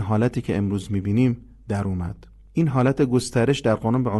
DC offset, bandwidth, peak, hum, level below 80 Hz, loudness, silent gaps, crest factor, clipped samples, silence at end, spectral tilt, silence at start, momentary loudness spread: under 0.1%; 12.5 kHz; -6 dBFS; none; -42 dBFS; -23 LUFS; none; 16 dB; under 0.1%; 0 s; -7 dB/octave; 0 s; 10 LU